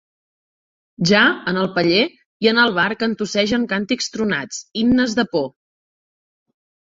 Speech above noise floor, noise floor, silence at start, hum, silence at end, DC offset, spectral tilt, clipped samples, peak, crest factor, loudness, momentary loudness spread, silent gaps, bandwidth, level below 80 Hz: over 72 dB; under -90 dBFS; 1 s; none; 1.4 s; under 0.1%; -4.5 dB/octave; under 0.1%; 0 dBFS; 20 dB; -18 LUFS; 8 LU; 2.26-2.40 s; 7.8 kHz; -52 dBFS